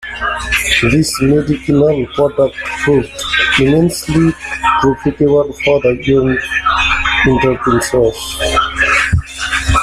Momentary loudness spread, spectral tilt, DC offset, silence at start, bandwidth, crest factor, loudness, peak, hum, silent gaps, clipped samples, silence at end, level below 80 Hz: 5 LU; -5 dB/octave; under 0.1%; 0 s; 15 kHz; 12 dB; -13 LUFS; 0 dBFS; none; none; under 0.1%; 0 s; -28 dBFS